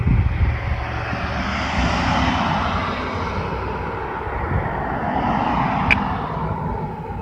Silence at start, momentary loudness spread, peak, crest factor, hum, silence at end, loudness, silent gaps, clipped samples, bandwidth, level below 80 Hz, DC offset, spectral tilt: 0 s; 7 LU; 0 dBFS; 20 dB; none; 0 s; -22 LUFS; none; under 0.1%; 8.8 kHz; -28 dBFS; under 0.1%; -6.5 dB/octave